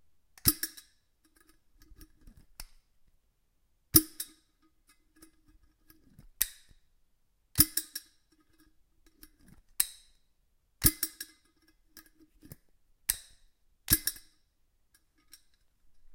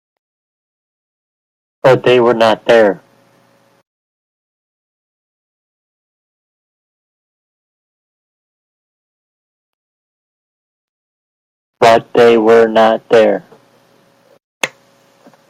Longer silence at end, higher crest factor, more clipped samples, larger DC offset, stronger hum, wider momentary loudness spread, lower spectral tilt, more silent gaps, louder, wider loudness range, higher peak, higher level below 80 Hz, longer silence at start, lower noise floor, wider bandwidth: first, 2 s vs 0.8 s; first, 34 dB vs 16 dB; neither; neither; neither; first, 27 LU vs 13 LU; second, -2 dB/octave vs -5 dB/octave; second, none vs 3.87-11.73 s, 14.44-14.61 s; second, -29 LUFS vs -11 LUFS; about the same, 4 LU vs 6 LU; second, -4 dBFS vs 0 dBFS; first, -52 dBFS vs -60 dBFS; second, 0.45 s vs 1.85 s; first, -72 dBFS vs -52 dBFS; first, 17 kHz vs 14 kHz